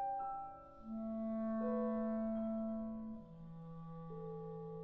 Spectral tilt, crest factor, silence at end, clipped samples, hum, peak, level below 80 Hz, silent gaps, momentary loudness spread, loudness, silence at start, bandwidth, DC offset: -9.5 dB/octave; 14 dB; 0 s; under 0.1%; none; -28 dBFS; -66 dBFS; none; 14 LU; -43 LUFS; 0 s; 3.7 kHz; under 0.1%